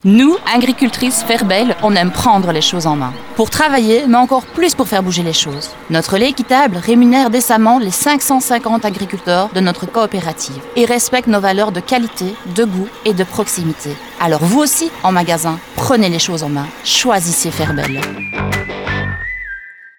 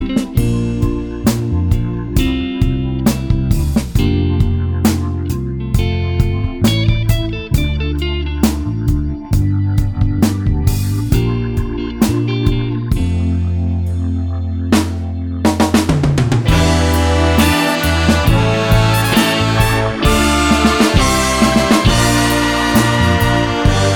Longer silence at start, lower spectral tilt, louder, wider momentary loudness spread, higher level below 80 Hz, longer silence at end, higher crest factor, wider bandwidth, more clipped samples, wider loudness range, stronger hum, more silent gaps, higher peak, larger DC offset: about the same, 0.05 s vs 0 s; second, -4 dB/octave vs -5.5 dB/octave; about the same, -14 LUFS vs -15 LUFS; about the same, 9 LU vs 7 LU; second, -42 dBFS vs -22 dBFS; about the same, 0.1 s vs 0 s; about the same, 12 dB vs 14 dB; about the same, over 20 kHz vs over 20 kHz; neither; about the same, 4 LU vs 5 LU; neither; neither; about the same, 0 dBFS vs 0 dBFS; neither